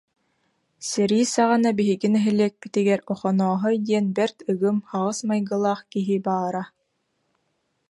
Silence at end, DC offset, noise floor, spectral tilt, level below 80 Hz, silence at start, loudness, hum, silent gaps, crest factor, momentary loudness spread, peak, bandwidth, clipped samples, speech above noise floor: 1.25 s; under 0.1%; -73 dBFS; -5.5 dB/octave; -70 dBFS; 0.8 s; -23 LUFS; none; none; 16 dB; 7 LU; -6 dBFS; 11.5 kHz; under 0.1%; 51 dB